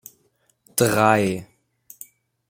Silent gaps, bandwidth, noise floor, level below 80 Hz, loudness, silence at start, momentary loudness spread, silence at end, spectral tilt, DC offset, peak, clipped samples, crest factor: none; 16.5 kHz; -65 dBFS; -58 dBFS; -20 LUFS; 0.75 s; 24 LU; 1.05 s; -4.5 dB/octave; under 0.1%; -2 dBFS; under 0.1%; 22 dB